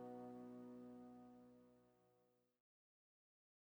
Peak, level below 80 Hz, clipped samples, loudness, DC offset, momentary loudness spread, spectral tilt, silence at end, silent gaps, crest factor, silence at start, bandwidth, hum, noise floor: -44 dBFS; under -90 dBFS; under 0.1%; -59 LUFS; under 0.1%; 10 LU; -8 dB/octave; 1.3 s; none; 16 dB; 0 s; over 20 kHz; none; -82 dBFS